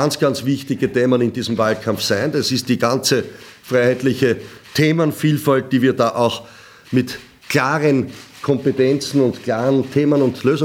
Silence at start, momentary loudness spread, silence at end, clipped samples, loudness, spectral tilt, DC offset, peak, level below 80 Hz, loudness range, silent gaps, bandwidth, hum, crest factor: 0 s; 6 LU; 0 s; under 0.1%; -18 LUFS; -5.5 dB/octave; under 0.1%; -2 dBFS; -58 dBFS; 2 LU; none; 17 kHz; none; 16 dB